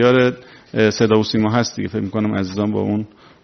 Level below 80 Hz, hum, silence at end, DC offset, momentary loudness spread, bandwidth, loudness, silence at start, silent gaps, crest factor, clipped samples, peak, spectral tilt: -54 dBFS; none; 0.4 s; under 0.1%; 10 LU; 6.4 kHz; -18 LUFS; 0 s; none; 16 dB; under 0.1%; 0 dBFS; -5 dB/octave